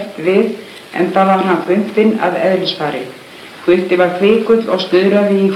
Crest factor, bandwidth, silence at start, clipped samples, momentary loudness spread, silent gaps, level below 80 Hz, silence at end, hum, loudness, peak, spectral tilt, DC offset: 14 dB; 13.5 kHz; 0 s; under 0.1%; 13 LU; none; -58 dBFS; 0 s; none; -13 LUFS; 0 dBFS; -6.5 dB/octave; under 0.1%